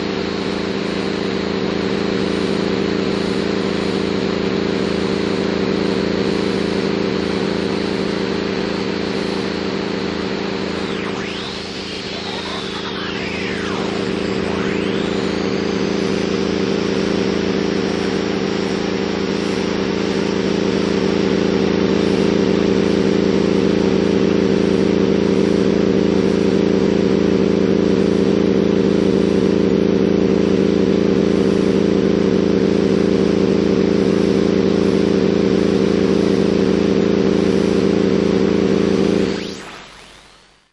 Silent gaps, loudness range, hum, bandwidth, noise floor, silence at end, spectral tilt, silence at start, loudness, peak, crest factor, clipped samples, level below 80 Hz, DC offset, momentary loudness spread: none; 6 LU; none; 10.5 kHz; -48 dBFS; 0.6 s; -6.5 dB/octave; 0 s; -17 LUFS; -4 dBFS; 12 dB; under 0.1%; -42 dBFS; under 0.1%; 6 LU